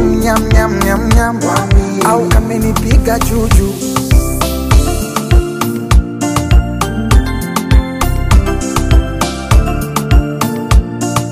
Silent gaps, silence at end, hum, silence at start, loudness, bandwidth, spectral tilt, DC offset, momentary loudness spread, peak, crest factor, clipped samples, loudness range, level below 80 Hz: none; 0 s; none; 0 s; -13 LUFS; 15.5 kHz; -5.5 dB/octave; under 0.1%; 5 LU; 0 dBFS; 10 dB; under 0.1%; 2 LU; -14 dBFS